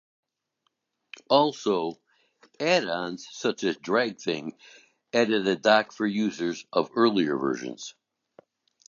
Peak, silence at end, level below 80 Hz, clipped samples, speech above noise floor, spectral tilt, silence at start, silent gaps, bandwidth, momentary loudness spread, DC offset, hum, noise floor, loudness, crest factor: -6 dBFS; 0.95 s; -74 dBFS; under 0.1%; 51 dB; -4.5 dB/octave; 1.3 s; none; 7.4 kHz; 11 LU; under 0.1%; none; -77 dBFS; -26 LUFS; 22 dB